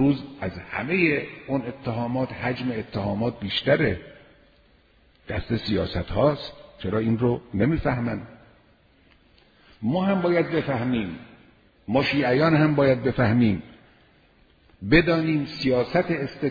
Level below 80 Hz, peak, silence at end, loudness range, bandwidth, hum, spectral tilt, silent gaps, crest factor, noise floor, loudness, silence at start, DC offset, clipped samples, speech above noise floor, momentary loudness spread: -46 dBFS; -4 dBFS; 0 s; 5 LU; 5 kHz; none; -8.5 dB/octave; none; 20 dB; -59 dBFS; -24 LUFS; 0 s; under 0.1%; under 0.1%; 35 dB; 12 LU